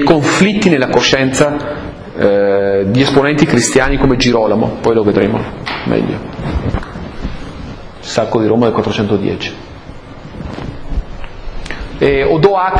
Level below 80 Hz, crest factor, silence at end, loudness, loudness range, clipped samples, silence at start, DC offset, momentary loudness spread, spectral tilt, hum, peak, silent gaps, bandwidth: -28 dBFS; 14 dB; 0 s; -13 LUFS; 7 LU; 0.2%; 0 s; under 0.1%; 18 LU; -5 dB/octave; none; 0 dBFS; none; 11 kHz